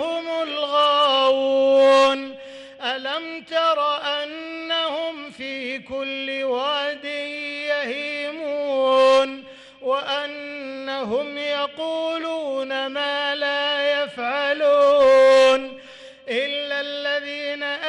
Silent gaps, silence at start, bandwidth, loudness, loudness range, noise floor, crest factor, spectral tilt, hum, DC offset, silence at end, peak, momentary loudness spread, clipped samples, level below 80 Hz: none; 0 s; 11 kHz; -21 LUFS; 8 LU; -43 dBFS; 14 dB; -2 dB/octave; none; under 0.1%; 0 s; -8 dBFS; 14 LU; under 0.1%; -64 dBFS